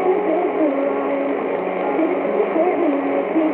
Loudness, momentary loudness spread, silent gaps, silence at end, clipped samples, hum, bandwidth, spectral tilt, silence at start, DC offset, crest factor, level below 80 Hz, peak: -20 LUFS; 3 LU; none; 0 s; under 0.1%; none; 4.1 kHz; -9.5 dB/octave; 0 s; under 0.1%; 12 dB; -66 dBFS; -6 dBFS